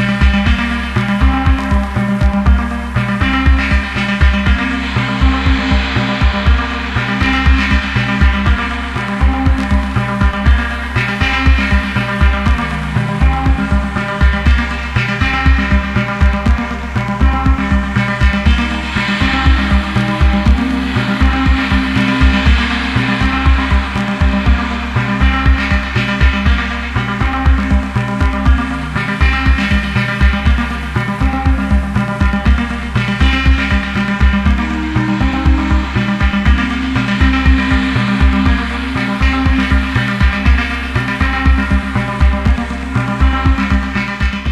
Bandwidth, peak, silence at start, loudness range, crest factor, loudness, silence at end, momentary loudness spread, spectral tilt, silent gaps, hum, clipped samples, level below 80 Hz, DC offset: 9 kHz; 0 dBFS; 0 s; 1 LU; 12 dB; -14 LUFS; 0 s; 5 LU; -6.5 dB/octave; none; none; under 0.1%; -16 dBFS; under 0.1%